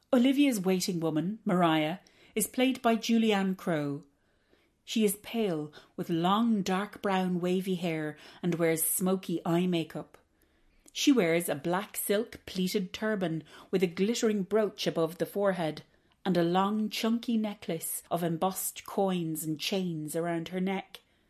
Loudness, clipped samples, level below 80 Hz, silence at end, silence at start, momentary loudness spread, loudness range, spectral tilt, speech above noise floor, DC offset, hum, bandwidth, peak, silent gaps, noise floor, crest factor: -30 LUFS; under 0.1%; -70 dBFS; 0.35 s; 0.1 s; 9 LU; 3 LU; -5 dB/octave; 39 dB; under 0.1%; none; 14.5 kHz; -12 dBFS; none; -69 dBFS; 18 dB